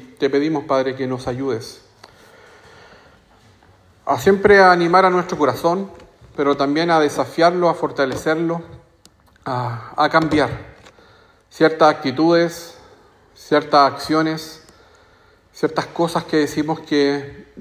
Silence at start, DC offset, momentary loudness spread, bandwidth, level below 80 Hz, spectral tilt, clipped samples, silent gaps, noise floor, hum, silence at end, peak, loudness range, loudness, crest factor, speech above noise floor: 0 s; under 0.1%; 13 LU; 16 kHz; -50 dBFS; -5.5 dB/octave; under 0.1%; none; -53 dBFS; none; 0 s; 0 dBFS; 8 LU; -18 LUFS; 18 dB; 35 dB